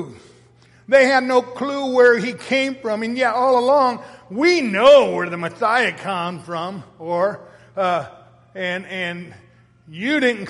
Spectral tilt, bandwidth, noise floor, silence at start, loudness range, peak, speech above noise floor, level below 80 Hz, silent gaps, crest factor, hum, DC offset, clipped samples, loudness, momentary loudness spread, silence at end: -4.5 dB/octave; 11.5 kHz; -51 dBFS; 0 s; 9 LU; -2 dBFS; 33 dB; -62 dBFS; none; 16 dB; none; under 0.1%; under 0.1%; -18 LUFS; 17 LU; 0 s